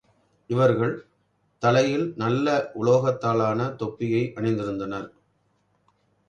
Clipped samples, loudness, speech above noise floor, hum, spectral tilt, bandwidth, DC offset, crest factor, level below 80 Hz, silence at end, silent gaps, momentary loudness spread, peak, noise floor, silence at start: under 0.1%; -24 LUFS; 45 dB; 50 Hz at -55 dBFS; -7 dB/octave; 9.6 kHz; under 0.1%; 18 dB; -60 dBFS; 1.2 s; none; 10 LU; -6 dBFS; -68 dBFS; 0.5 s